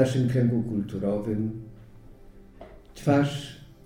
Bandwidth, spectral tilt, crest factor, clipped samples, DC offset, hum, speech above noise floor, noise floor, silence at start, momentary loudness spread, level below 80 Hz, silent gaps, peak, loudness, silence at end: 14 kHz; -7.5 dB/octave; 20 dB; under 0.1%; under 0.1%; none; 23 dB; -48 dBFS; 0 s; 18 LU; -50 dBFS; none; -8 dBFS; -26 LUFS; 0.1 s